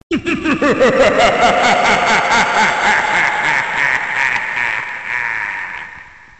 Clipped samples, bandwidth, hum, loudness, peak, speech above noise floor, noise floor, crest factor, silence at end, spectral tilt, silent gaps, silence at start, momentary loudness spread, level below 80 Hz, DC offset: under 0.1%; 9 kHz; none; -13 LUFS; -2 dBFS; 25 dB; -37 dBFS; 12 dB; 0.3 s; -3 dB/octave; none; 0.1 s; 9 LU; -42 dBFS; 0.3%